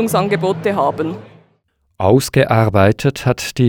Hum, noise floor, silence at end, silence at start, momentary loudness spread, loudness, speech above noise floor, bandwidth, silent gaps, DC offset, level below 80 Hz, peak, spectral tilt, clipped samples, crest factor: none; -62 dBFS; 0 s; 0 s; 8 LU; -15 LUFS; 48 dB; 20 kHz; none; under 0.1%; -46 dBFS; -2 dBFS; -6 dB/octave; under 0.1%; 14 dB